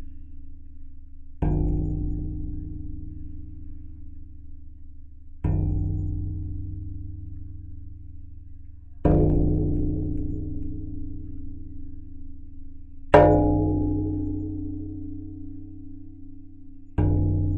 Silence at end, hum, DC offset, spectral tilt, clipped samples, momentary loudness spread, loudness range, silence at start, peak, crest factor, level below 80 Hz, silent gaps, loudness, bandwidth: 0 s; none; under 0.1%; -10.5 dB/octave; under 0.1%; 25 LU; 11 LU; 0 s; 0 dBFS; 26 dB; -34 dBFS; none; -26 LUFS; 4.3 kHz